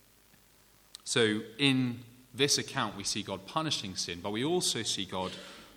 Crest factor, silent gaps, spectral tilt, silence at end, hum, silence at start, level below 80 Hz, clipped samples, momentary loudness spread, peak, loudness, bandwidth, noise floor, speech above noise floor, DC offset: 22 dB; none; -3 dB/octave; 0.05 s; none; 1.05 s; -68 dBFS; under 0.1%; 13 LU; -10 dBFS; -31 LUFS; 19.5 kHz; -62 dBFS; 31 dB; under 0.1%